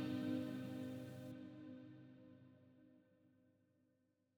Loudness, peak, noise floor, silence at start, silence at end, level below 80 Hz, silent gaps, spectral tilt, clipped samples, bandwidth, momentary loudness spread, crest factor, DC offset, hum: -49 LUFS; -34 dBFS; -82 dBFS; 0 s; 1.1 s; -84 dBFS; none; -7 dB/octave; under 0.1%; over 20 kHz; 24 LU; 18 dB; under 0.1%; none